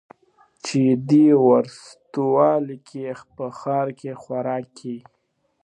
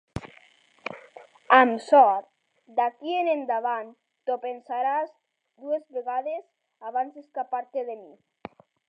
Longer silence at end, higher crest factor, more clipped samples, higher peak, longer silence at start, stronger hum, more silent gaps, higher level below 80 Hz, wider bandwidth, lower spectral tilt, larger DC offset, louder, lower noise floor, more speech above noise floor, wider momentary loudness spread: second, 0.65 s vs 0.85 s; second, 18 dB vs 24 dB; neither; about the same, -4 dBFS vs -2 dBFS; first, 0.65 s vs 0.15 s; neither; neither; second, -70 dBFS vs -62 dBFS; about the same, 9.8 kHz vs 9.4 kHz; first, -7.5 dB/octave vs -5.5 dB/octave; neither; first, -20 LUFS vs -25 LUFS; first, -70 dBFS vs -58 dBFS; first, 49 dB vs 33 dB; second, 19 LU vs 24 LU